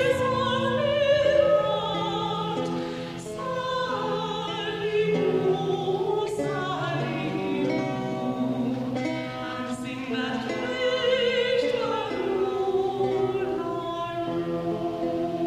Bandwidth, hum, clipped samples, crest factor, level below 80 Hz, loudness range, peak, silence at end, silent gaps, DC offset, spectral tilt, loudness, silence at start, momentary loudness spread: 13.5 kHz; none; under 0.1%; 16 dB; -56 dBFS; 4 LU; -10 dBFS; 0 s; none; under 0.1%; -6 dB/octave; -26 LUFS; 0 s; 7 LU